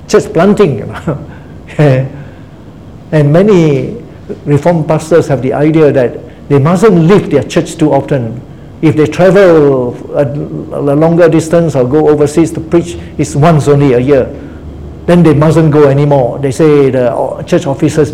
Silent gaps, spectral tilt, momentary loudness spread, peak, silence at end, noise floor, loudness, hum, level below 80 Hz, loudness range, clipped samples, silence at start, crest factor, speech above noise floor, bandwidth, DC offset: none; -7.5 dB/octave; 14 LU; 0 dBFS; 0 s; -30 dBFS; -9 LUFS; none; -34 dBFS; 3 LU; 2%; 0 s; 8 dB; 23 dB; 13 kHz; 0.8%